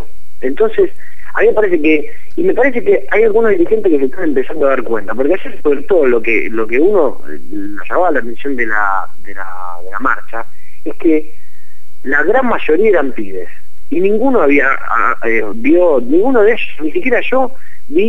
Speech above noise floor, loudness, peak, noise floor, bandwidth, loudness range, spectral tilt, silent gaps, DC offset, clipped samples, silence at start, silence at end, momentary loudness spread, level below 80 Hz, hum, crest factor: 36 dB; -13 LUFS; 0 dBFS; -49 dBFS; 12 kHz; 6 LU; -7 dB/octave; none; 30%; under 0.1%; 0 s; 0 s; 15 LU; -44 dBFS; none; 16 dB